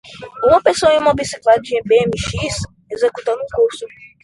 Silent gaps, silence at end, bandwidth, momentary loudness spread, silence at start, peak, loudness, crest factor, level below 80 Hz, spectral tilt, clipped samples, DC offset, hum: none; 0.2 s; 11.5 kHz; 13 LU; 0.05 s; 0 dBFS; -16 LUFS; 16 dB; -40 dBFS; -4 dB/octave; under 0.1%; under 0.1%; none